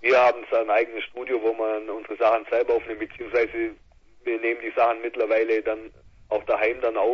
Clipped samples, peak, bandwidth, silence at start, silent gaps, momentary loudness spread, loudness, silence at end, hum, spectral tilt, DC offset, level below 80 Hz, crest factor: under 0.1%; -6 dBFS; 7 kHz; 0 s; none; 10 LU; -24 LUFS; 0 s; none; -5 dB/octave; under 0.1%; -58 dBFS; 18 dB